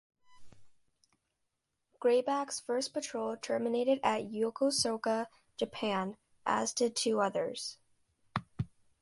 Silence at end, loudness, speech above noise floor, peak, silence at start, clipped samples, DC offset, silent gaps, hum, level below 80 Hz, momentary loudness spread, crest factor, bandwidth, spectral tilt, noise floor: 0.35 s; -34 LUFS; 51 dB; -16 dBFS; 0.3 s; under 0.1%; under 0.1%; none; none; -68 dBFS; 11 LU; 18 dB; 11.5 kHz; -3.5 dB/octave; -84 dBFS